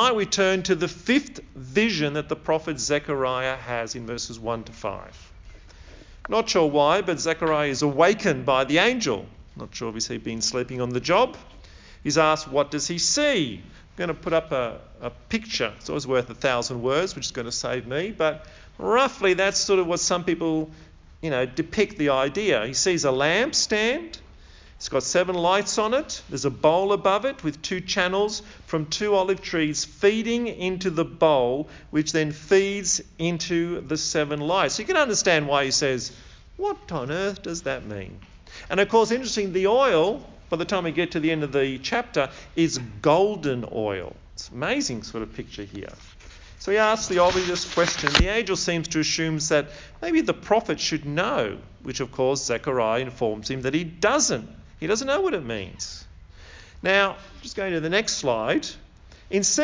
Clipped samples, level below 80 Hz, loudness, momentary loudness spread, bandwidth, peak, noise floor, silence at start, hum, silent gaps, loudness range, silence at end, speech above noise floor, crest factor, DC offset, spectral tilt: under 0.1%; -46 dBFS; -24 LUFS; 13 LU; 7.6 kHz; -2 dBFS; -48 dBFS; 0 s; none; none; 4 LU; 0 s; 24 dB; 24 dB; under 0.1%; -3.5 dB/octave